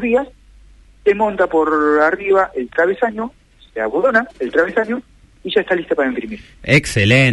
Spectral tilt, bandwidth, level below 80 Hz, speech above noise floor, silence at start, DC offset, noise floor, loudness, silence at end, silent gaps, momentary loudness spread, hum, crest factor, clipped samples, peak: -6 dB/octave; 11.5 kHz; -44 dBFS; 29 dB; 0 s; under 0.1%; -45 dBFS; -16 LUFS; 0 s; none; 13 LU; none; 16 dB; under 0.1%; -2 dBFS